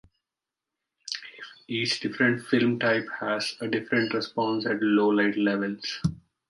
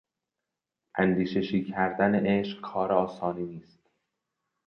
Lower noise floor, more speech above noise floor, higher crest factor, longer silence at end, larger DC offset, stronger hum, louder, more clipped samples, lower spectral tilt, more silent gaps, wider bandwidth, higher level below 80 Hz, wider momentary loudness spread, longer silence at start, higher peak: about the same, -89 dBFS vs -87 dBFS; about the same, 63 dB vs 60 dB; about the same, 18 dB vs 20 dB; second, 0.3 s vs 1.05 s; neither; neither; about the same, -26 LUFS vs -28 LUFS; neither; second, -5 dB/octave vs -8.5 dB/octave; neither; first, 11.5 kHz vs 6.2 kHz; about the same, -58 dBFS vs -62 dBFS; about the same, 12 LU vs 12 LU; about the same, 1.05 s vs 0.95 s; about the same, -8 dBFS vs -10 dBFS